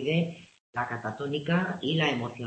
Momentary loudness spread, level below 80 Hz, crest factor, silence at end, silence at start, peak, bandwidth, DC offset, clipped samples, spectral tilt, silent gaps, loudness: 9 LU; -68 dBFS; 16 dB; 0 s; 0 s; -12 dBFS; 8.6 kHz; under 0.1%; under 0.1%; -6.5 dB/octave; 0.60-0.73 s; -29 LUFS